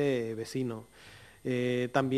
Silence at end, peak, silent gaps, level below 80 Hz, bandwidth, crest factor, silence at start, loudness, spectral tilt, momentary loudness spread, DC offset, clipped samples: 0 s; -12 dBFS; none; -68 dBFS; 13.5 kHz; 20 dB; 0 s; -33 LUFS; -6.5 dB/octave; 22 LU; under 0.1%; under 0.1%